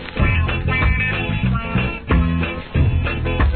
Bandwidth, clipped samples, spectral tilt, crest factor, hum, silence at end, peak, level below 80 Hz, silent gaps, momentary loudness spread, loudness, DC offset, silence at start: 4.5 kHz; under 0.1%; -10.5 dB/octave; 14 dB; none; 0 s; -4 dBFS; -22 dBFS; none; 4 LU; -19 LUFS; 0.3%; 0 s